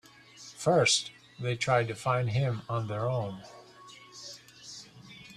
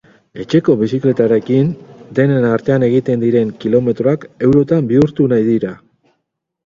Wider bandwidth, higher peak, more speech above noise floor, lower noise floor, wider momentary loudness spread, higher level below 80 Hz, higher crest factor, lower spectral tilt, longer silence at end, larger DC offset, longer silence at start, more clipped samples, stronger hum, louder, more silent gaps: first, 13 kHz vs 7.4 kHz; second, -12 dBFS vs 0 dBFS; second, 24 dB vs 59 dB; second, -52 dBFS vs -72 dBFS; first, 24 LU vs 5 LU; second, -66 dBFS vs -50 dBFS; first, 20 dB vs 14 dB; second, -4 dB/octave vs -9 dB/octave; second, 0 s vs 0.9 s; neither; about the same, 0.35 s vs 0.35 s; neither; neither; second, -29 LUFS vs -14 LUFS; neither